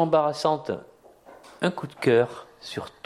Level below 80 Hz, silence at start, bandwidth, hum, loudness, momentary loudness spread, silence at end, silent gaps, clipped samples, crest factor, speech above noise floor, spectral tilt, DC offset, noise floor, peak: -66 dBFS; 0 s; 13.5 kHz; none; -26 LUFS; 14 LU; 0.15 s; none; under 0.1%; 18 dB; 26 dB; -6 dB/octave; under 0.1%; -51 dBFS; -8 dBFS